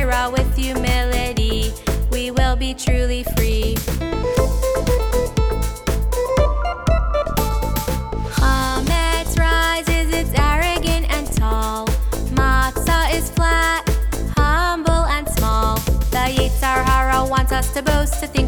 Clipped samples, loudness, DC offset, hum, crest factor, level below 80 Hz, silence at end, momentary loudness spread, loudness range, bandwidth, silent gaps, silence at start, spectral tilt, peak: under 0.1%; -19 LUFS; under 0.1%; none; 16 dB; -20 dBFS; 0 s; 5 LU; 2 LU; over 20 kHz; none; 0 s; -4.5 dB/octave; 0 dBFS